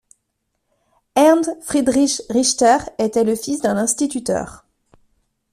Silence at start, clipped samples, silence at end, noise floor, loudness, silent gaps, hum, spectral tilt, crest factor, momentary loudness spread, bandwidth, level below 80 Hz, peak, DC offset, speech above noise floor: 1.15 s; under 0.1%; 0.95 s; -73 dBFS; -17 LUFS; none; none; -3.5 dB/octave; 16 dB; 9 LU; 14.5 kHz; -52 dBFS; -2 dBFS; under 0.1%; 55 dB